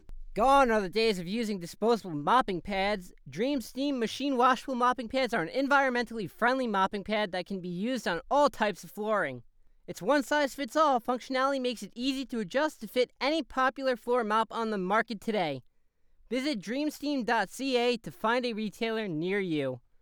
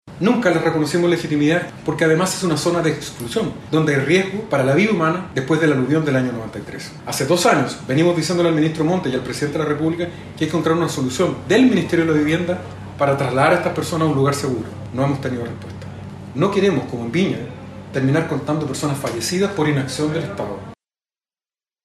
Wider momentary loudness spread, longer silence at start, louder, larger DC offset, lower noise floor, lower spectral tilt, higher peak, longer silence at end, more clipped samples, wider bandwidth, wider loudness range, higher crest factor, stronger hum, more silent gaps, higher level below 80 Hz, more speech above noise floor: second, 8 LU vs 12 LU; about the same, 0.1 s vs 0.05 s; second, -29 LUFS vs -19 LUFS; neither; second, -64 dBFS vs under -90 dBFS; about the same, -4.5 dB/octave vs -5.5 dB/octave; second, -10 dBFS vs -2 dBFS; second, 0.25 s vs 1.1 s; neither; first, over 20 kHz vs 15 kHz; about the same, 3 LU vs 4 LU; about the same, 18 dB vs 16 dB; neither; neither; about the same, -54 dBFS vs -52 dBFS; second, 35 dB vs over 72 dB